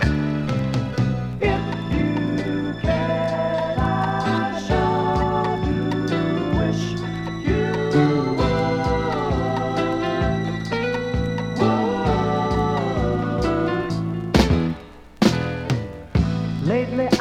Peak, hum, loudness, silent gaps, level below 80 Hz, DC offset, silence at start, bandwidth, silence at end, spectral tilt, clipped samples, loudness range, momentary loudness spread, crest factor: -2 dBFS; none; -22 LUFS; none; -34 dBFS; under 0.1%; 0 s; 13 kHz; 0 s; -7 dB/octave; under 0.1%; 1 LU; 5 LU; 20 dB